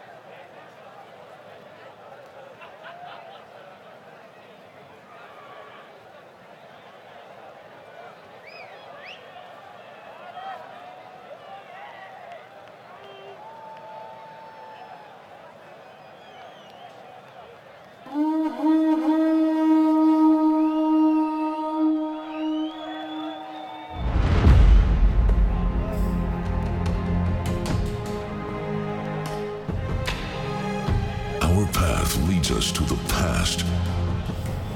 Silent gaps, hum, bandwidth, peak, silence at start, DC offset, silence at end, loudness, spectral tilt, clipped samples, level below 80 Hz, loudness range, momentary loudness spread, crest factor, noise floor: none; none; 17 kHz; -6 dBFS; 0 s; under 0.1%; 0 s; -24 LUFS; -6 dB/octave; under 0.1%; -30 dBFS; 23 LU; 25 LU; 20 dB; -47 dBFS